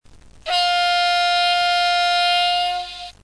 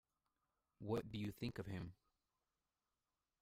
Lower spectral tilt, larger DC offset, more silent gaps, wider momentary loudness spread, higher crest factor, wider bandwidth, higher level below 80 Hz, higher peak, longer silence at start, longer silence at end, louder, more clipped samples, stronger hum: second, 0.5 dB/octave vs -7 dB/octave; first, 0.1% vs under 0.1%; neither; about the same, 8 LU vs 10 LU; second, 10 dB vs 20 dB; second, 11 kHz vs 15.5 kHz; first, -52 dBFS vs -70 dBFS; first, -8 dBFS vs -32 dBFS; second, 0.1 s vs 0.8 s; second, 0.1 s vs 1.5 s; first, -17 LUFS vs -48 LUFS; neither; neither